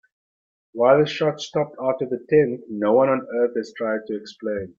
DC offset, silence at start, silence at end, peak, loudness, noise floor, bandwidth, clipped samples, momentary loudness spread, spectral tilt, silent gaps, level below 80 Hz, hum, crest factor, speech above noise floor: under 0.1%; 0.75 s; 0.1 s; -4 dBFS; -22 LUFS; under -90 dBFS; 7.4 kHz; under 0.1%; 11 LU; -6.5 dB/octave; none; -64 dBFS; none; 18 dB; over 69 dB